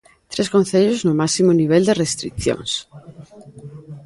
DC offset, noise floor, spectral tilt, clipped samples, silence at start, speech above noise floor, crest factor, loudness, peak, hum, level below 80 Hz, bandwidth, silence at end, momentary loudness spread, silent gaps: under 0.1%; -39 dBFS; -5 dB/octave; under 0.1%; 0.3 s; 22 dB; 16 dB; -18 LUFS; -2 dBFS; none; -46 dBFS; 11.5 kHz; 0.05 s; 14 LU; none